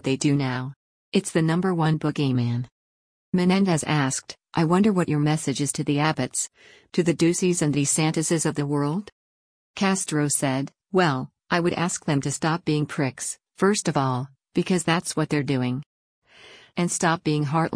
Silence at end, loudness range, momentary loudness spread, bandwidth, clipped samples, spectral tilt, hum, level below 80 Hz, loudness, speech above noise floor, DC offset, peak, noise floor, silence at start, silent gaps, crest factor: 0 s; 2 LU; 8 LU; 10.5 kHz; under 0.1%; -5 dB/octave; none; -60 dBFS; -24 LUFS; 27 dB; under 0.1%; -8 dBFS; -50 dBFS; 0.05 s; 0.76-1.12 s, 2.71-3.33 s, 9.12-9.74 s, 15.86-16.22 s; 16 dB